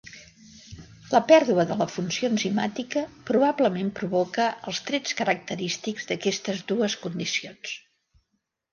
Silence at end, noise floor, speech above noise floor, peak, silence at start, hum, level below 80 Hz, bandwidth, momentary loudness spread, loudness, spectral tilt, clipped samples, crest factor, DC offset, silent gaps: 0.95 s; -77 dBFS; 53 dB; -4 dBFS; 0.05 s; none; -64 dBFS; 10 kHz; 15 LU; -25 LUFS; -4.5 dB/octave; under 0.1%; 22 dB; under 0.1%; none